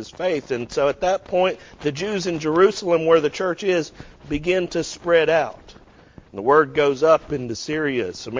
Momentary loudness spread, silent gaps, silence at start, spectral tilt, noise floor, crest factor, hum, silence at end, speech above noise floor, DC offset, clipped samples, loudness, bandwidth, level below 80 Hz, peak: 10 LU; none; 0 s; -5 dB/octave; -48 dBFS; 18 dB; none; 0 s; 27 dB; under 0.1%; under 0.1%; -21 LUFS; 7.6 kHz; -50 dBFS; -4 dBFS